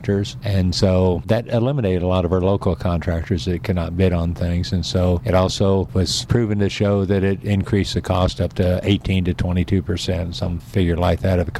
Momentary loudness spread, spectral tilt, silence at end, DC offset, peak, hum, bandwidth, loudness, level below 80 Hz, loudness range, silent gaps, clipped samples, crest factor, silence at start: 4 LU; -6.5 dB/octave; 0 s; under 0.1%; -6 dBFS; none; 12.5 kHz; -20 LUFS; -34 dBFS; 1 LU; none; under 0.1%; 14 dB; 0 s